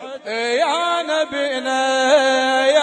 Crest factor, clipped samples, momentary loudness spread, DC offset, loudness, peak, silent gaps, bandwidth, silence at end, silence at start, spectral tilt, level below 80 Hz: 14 dB; under 0.1%; 7 LU; under 0.1%; -18 LUFS; -4 dBFS; none; 10.5 kHz; 0 s; 0 s; -0.5 dB/octave; -70 dBFS